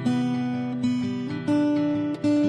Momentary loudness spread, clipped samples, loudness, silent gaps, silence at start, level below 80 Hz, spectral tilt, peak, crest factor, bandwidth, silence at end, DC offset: 5 LU; under 0.1%; -25 LUFS; none; 0 s; -62 dBFS; -7.5 dB/octave; -12 dBFS; 12 dB; 9.4 kHz; 0 s; under 0.1%